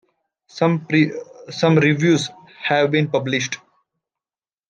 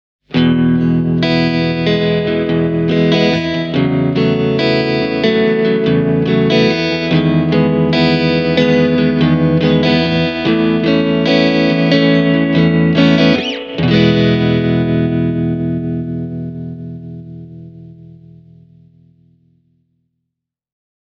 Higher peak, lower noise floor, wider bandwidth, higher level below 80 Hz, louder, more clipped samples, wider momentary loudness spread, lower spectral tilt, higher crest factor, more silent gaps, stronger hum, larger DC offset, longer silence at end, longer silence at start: second, -4 dBFS vs 0 dBFS; first, under -90 dBFS vs -78 dBFS; first, 9.2 kHz vs 6.6 kHz; second, -64 dBFS vs -40 dBFS; second, -19 LUFS vs -13 LUFS; neither; first, 16 LU vs 8 LU; second, -5.5 dB/octave vs -7.5 dB/octave; about the same, 18 dB vs 14 dB; neither; neither; neither; second, 1.15 s vs 3 s; first, 0.55 s vs 0.3 s